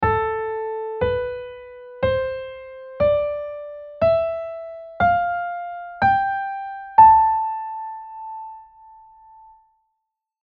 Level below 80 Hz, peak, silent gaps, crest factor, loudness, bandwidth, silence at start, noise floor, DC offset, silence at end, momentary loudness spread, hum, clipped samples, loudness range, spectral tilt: -46 dBFS; -2 dBFS; none; 20 dB; -20 LUFS; 5 kHz; 0 s; -79 dBFS; under 0.1%; 1.8 s; 19 LU; none; under 0.1%; 6 LU; -4 dB/octave